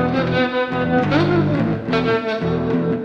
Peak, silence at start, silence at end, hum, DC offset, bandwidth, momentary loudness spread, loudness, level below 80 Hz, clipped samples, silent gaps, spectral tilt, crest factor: -2 dBFS; 0 s; 0 s; none; under 0.1%; 7.2 kHz; 4 LU; -19 LUFS; -44 dBFS; under 0.1%; none; -8 dB/octave; 16 dB